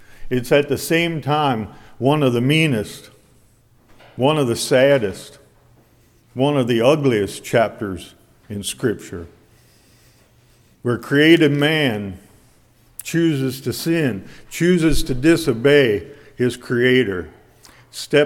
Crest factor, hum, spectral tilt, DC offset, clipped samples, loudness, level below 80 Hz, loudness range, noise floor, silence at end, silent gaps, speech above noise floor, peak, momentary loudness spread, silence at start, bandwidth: 18 dB; none; -5.5 dB/octave; under 0.1%; under 0.1%; -18 LUFS; -38 dBFS; 4 LU; -54 dBFS; 0 s; none; 37 dB; 0 dBFS; 18 LU; 0.1 s; 18 kHz